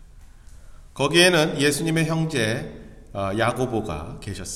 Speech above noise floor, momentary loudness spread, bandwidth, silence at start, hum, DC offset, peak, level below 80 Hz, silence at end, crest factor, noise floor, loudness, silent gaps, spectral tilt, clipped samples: 23 dB; 17 LU; 15 kHz; 0 s; none; under 0.1%; -2 dBFS; -44 dBFS; 0 s; 22 dB; -45 dBFS; -21 LUFS; none; -4 dB/octave; under 0.1%